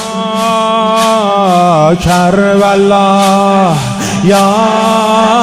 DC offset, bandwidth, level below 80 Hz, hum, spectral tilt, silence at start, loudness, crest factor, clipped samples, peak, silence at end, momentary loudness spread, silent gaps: under 0.1%; 16 kHz; -36 dBFS; none; -5 dB/octave; 0 s; -9 LUFS; 8 dB; 0.6%; 0 dBFS; 0 s; 4 LU; none